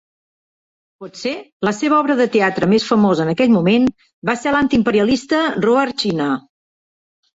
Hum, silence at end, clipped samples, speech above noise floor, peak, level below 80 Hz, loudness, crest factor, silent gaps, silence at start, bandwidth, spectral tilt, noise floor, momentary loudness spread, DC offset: none; 1 s; under 0.1%; over 74 dB; -2 dBFS; -52 dBFS; -16 LUFS; 14 dB; 1.52-1.60 s, 4.13-4.22 s; 1 s; 8 kHz; -6 dB/octave; under -90 dBFS; 11 LU; under 0.1%